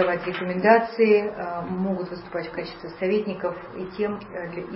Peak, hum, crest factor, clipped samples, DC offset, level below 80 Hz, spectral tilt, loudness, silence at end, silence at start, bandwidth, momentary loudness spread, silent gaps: -4 dBFS; none; 20 dB; under 0.1%; under 0.1%; -56 dBFS; -10.5 dB/octave; -25 LUFS; 0 s; 0 s; 5.8 kHz; 15 LU; none